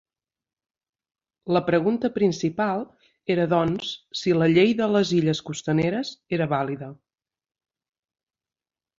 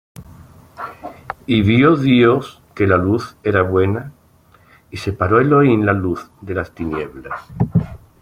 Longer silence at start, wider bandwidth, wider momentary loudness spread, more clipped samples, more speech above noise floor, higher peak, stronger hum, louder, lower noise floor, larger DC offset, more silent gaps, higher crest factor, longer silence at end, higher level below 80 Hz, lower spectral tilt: first, 1.45 s vs 0.2 s; second, 7.8 kHz vs 15 kHz; second, 12 LU vs 19 LU; neither; first, over 67 dB vs 35 dB; second, -6 dBFS vs -2 dBFS; neither; second, -23 LUFS vs -16 LUFS; first, under -90 dBFS vs -51 dBFS; neither; neither; about the same, 18 dB vs 16 dB; first, 2.05 s vs 0.25 s; second, -60 dBFS vs -44 dBFS; second, -6 dB/octave vs -8 dB/octave